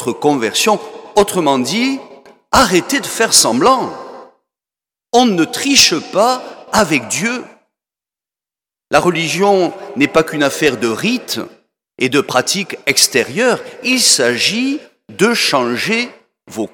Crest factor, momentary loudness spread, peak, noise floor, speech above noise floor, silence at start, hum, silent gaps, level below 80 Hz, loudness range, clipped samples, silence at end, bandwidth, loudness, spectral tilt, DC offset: 16 dB; 11 LU; 0 dBFS; -89 dBFS; 75 dB; 0 s; none; none; -48 dBFS; 4 LU; under 0.1%; 0.05 s; 19.5 kHz; -13 LUFS; -2.5 dB/octave; under 0.1%